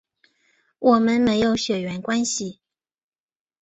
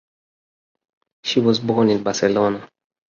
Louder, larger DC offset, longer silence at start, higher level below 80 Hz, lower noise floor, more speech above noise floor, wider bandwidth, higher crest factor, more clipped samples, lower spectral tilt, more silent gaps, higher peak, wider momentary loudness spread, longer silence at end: about the same, -21 LUFS vs -19 LUFS; neither; second, 0.8 s vs 1.25 s; about the same, -56 dBFS vs -58 dBFS; second, -65 dBFS vs under -90 dBFS; second, 45 dB vs over 72 dB; first, 8.2 kHz vs 7.4 kHz; about the same, 18 dB vs 18 dB; neither; about the same, -4 dB/octave vs -5 dB/octave; neither; about the same, -6 dBFS vs -4 dBFS; about the same, 9 LU vs 7 LU; first, 1.1 s vs 0.4 s